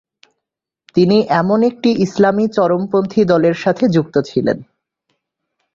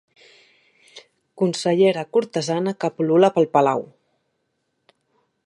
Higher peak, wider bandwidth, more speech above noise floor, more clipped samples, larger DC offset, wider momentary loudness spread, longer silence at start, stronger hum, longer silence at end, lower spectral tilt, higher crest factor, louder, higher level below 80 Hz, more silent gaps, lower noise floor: about the same, -2 dBFS vs -4 dBFS; second, 7.6 kHz vs 11.5 kHz; first, 67 dB vs 54 dB; neither; neither; second, 5 LU vs 8 LU; about the same, 0.95 s vs 0.95 s; neither; second, 1.1 s vs 1.6 s; first, -7.5 dB/octave vs -6 dB/octave; second, 14 dB vs 20 dB; first, -15 LUFS vs -20 LUFS; first, -54 dBFS vs -74 dBFS; neither; first, -81 dBFS vs -73 dBFS